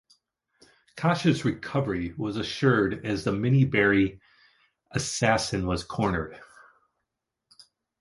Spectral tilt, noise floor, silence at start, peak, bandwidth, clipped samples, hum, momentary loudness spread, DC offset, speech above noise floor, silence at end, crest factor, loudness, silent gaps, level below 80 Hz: -5.5 dB/octave; -84 dBFS; 0.95 s; -6 dBFS; 11.5 kHz; under 0.1%; none; 9 LU; under 0.1%; 59 dB; 1.55 s; 22 dB; -26 LUFS; none; -50 dBFS